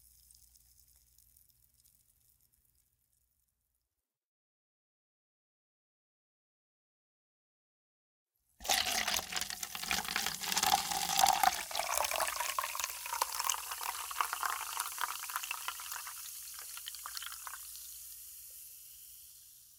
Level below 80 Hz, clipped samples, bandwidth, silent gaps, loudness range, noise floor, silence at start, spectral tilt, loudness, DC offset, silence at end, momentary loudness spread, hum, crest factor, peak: -68 dBFS; under 0.1%; 18 kHz; 4.24-8.27 s; 12 LU; -89 dBFS; 0.4 s; 0.5 dB/octave; -35 LUFS; under 0.1%; 0 s; 18 LU; 60 Hz at -80 dBFS; 32 dB; -8 dBFS